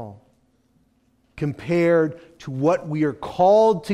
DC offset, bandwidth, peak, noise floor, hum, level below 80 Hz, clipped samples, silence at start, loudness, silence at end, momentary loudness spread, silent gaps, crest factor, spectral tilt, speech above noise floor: under 0.1%; 12.5 kHz; -6 dBFS; -63 dBFS; none; -56 dBFS; under 0.1%; 0 s; -20 LUFS; 0 s; 16 LU; none; 16 dB; -7.5 dB/octave; 43 dB